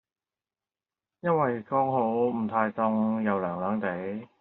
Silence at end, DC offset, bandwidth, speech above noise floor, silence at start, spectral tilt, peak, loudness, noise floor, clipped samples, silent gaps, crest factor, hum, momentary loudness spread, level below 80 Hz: 0.15 s; under 0.1%; 4.1 kHz; over 63 dB; 1.25 s; -7.5 dB/octave; -10 dBFS; -28 LUFS; under -90 dBFS; under 0.1%; none; 20 dB; none; 6 LU; -74 dBFS